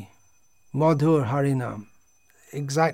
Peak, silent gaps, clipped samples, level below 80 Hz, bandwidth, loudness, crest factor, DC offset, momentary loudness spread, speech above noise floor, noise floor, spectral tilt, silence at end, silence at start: -10 dBFS; none; under 0.1%; -66 dBFS; 15.5 kHz; -24 LUFS; 16 dB; 0.2%; 15 LU; 42 dB; -65 dBFS; -7 dB/octave; 0 s; 0 s